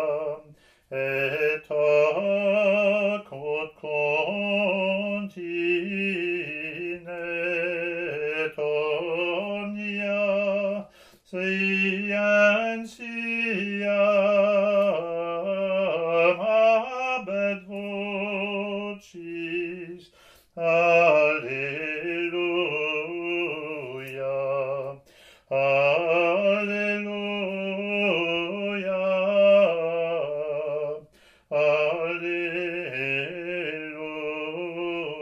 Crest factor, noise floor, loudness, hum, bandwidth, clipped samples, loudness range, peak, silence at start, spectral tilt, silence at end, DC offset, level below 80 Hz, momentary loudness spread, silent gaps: 18 dB; -56 dBFS; -25 LUFS; none; 8.2 kHz; under 0.1%; 5 LU; -6 dBFS; 0 s; -6 dB/octave; 0 s; under 0.1%; -70 dBFS; 11 LU; none